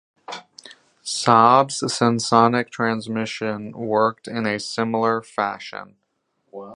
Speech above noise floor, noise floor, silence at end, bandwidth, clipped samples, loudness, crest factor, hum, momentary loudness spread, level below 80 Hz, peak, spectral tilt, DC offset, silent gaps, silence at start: 51 dB; -71 dBFS; 0 s; 11.5 kHz; under 0.1%; -20 LUFS; 20 dB; none; 20 LU; -66 dBFS; 0 dBFS; -4.5 dB/octave; under 0.1%; none; 0.3 s